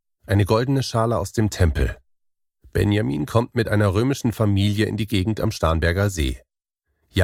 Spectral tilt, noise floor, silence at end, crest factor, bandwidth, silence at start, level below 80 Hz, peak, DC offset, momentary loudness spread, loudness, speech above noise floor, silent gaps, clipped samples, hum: -6.5 dB/octave; -76 dBFS; 0 s; 18 dB; 15.5 kHz; 0.3 s; -34 dBFS; -4 dBFS; under 0.1%; 6 LU; -21 LUFS; 56 dB; none; under 0.1%; none